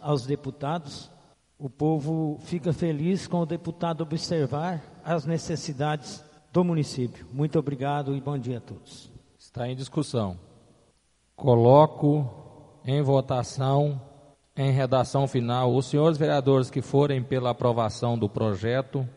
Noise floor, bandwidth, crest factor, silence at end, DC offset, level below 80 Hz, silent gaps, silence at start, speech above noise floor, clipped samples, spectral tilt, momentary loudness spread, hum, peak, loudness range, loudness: -66 dBFS; 11.5 kHz; 22 dB; 0.05 s; under 0.1%; -60 dBFS; none; 0 s; 41 dB; under 0.1%; -7.5 dB/octave; 13 LU; none; -4 dBFS; 7 LU; -26 LUFS